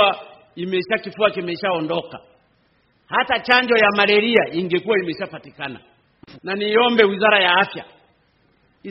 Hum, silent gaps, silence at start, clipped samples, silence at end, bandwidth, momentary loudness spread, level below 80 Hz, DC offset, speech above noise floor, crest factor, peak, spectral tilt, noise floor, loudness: none; none; 0 s; under 0.1%; 0 s; 5.8 kHz; 17 LU; -62 dBFS; under 0.1%; 43 dB; 20 dB; 0 dBFS; -1.5 dB/octave; -61 dBFS; -18 LUFS